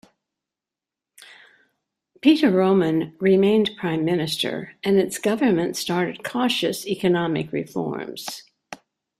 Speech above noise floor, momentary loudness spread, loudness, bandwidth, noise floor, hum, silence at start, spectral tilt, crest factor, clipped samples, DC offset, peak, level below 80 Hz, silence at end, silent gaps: 67 dB; 14 LU; -21 LUFS; 15 kHz; -88 dBFS; none; 2.25 s; -5.5 dB/octave; 18 dB; under 0.1%; under 0.1%; -4 dBFS; -64 dBFS; 0.45 s; none